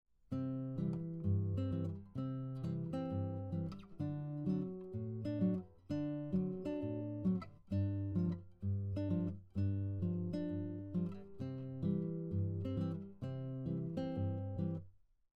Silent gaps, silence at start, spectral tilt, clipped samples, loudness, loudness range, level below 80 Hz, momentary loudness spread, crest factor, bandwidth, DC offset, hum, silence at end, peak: none; 0.3 s; -10.5 dB/octave; under 0.1%; -41 LUFS; 2 LU; -66 dBFS; 6 LU; 14 dB; 5.4 kHz; under 0.1%; none; 0.4 s; -26 dBFS